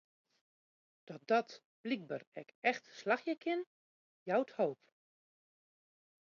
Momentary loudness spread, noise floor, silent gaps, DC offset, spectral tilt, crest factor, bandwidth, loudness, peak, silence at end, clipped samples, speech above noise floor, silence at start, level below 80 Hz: 18 LU; under -90 dBFS; 1.65-1.84 s, 2.27-2.32 s, 2.55-2.62 s, 3.67-4.26 s; under 0.1%; -3 dB/octave; 22 dB; 7.2 kHz; -37 LUFS; -18 dBFS; 1.6 s; under 0.1%; over 53 dB; 1.1 s; under -90 dBFS